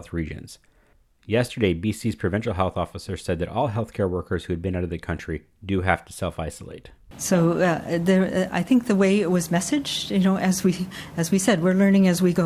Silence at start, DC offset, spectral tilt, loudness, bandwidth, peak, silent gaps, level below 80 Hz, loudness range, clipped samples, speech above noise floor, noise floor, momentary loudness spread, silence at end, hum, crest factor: 0 s; under 0.1%; -5.5 dB/octave; -23 LUFS; 15.5 kHz; -2 dBFS; none; -42 dBFS; 6 LU; under 0.1%; 37 dB; -59 dBFS; 12 LU; 0 s; none; 20 dB